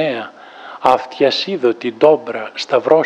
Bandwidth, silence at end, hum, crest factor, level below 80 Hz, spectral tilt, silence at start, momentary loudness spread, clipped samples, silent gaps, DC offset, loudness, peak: 8.8 kHz; 0 s; none; 16 dB; -62 dBFS; -5 dB/octave; 0 s; 15 LU; under 0.1%; none; under 0.1%; -16 LUFS; 0 dBFS